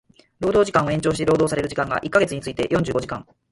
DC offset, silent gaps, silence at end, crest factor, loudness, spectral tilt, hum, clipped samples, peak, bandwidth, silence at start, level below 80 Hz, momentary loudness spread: under 0.1%; none; 0.3 s; 18 dB; -21 LUFS; -5.5 dB/octave; none; under 0.1%; -4 dBFS; 11.5 kHz; 0.4 s; -46 dBFS; 8 LU